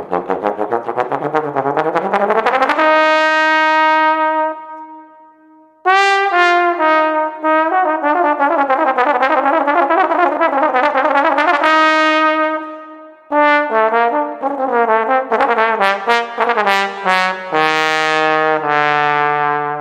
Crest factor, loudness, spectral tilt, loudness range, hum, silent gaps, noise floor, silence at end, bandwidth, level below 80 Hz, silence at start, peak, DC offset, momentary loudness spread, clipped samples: 14 dB; -14 LUFS; -4 dB/octave; 2 LU; none; none; -47 dBFS; 0 s; 14 kHz; -66 dBFS; 0 s; 0 dBFS; under 0.1%; 7 LU; under 0.1%